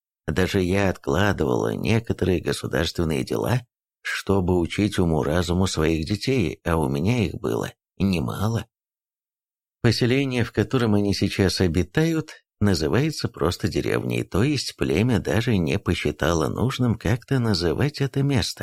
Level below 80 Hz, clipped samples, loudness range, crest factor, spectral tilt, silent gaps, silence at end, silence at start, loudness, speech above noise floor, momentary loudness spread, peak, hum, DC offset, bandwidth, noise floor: -42 dBFS; under 0.1%; 3 LU; 18 dB; -6 dB/octave; none; 0 s; 0.25 s; -23 LUFS; over 68 dB; 4 LU; -4 dBFS; none; under 0.1%; 15.5 kHz; under -90 dBFS